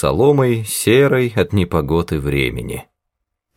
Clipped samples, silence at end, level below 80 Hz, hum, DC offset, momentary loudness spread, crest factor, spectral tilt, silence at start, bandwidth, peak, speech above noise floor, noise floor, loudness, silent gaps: under 0.1%; 0.75 s; -36 dBFS; none; under 0.1%; 10 LU; 16 dB; -5.5 dB/octave; 0 s; 18 kHz; -2 dBFS; 61 dB; -77 dBFS; -16 LUFS; none